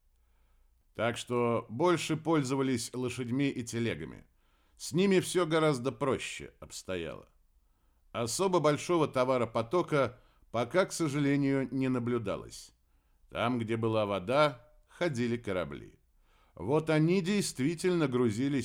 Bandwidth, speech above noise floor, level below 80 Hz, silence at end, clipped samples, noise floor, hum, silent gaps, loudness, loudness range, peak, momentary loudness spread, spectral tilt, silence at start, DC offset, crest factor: 16.5 kHz; 38 dB; -62 dBFS; 0 s; under 0.1%; -68 dBFS; none; none; -31 LUFS; 3 LU; -12 dBFS; 13 LU; -5.5 dB/octave; 0.95 s; under 0.1%; 18 dB